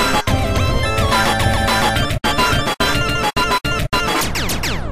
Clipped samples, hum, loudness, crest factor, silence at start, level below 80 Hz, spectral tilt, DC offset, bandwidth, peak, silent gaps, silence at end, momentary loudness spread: under 0.1%; none; -17 LUFS; 14 dB; 0 s; -26 dBFS; -4 dB/octave; 3%; 15.5 kHz; -4 dBFS; none; 0 s; 3 LU